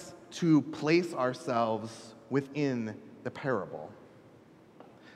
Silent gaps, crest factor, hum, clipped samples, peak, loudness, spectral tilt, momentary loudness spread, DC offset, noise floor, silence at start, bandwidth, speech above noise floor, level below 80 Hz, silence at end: none; 20 dB; none; under 0.1%; -12 dBFS; -31 LUFS; -6.5 dB/octave; 17 LU; under 0.1%; -57 dBFS; 0 s; 12 kHz; 26 dB; -76 dBFS; 0 s